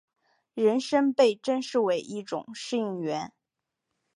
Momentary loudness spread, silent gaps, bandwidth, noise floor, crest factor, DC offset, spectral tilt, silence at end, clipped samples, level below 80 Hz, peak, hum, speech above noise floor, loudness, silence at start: 12 LU; none; 11 kHz; -86 dBFS; 18 dB; under 0.1%; -5 dB/octave; 0.9 s; under 0.1%; -80 dBFS; -10 dBFS; none; 59 dB; -27 LUFS; 0.55 s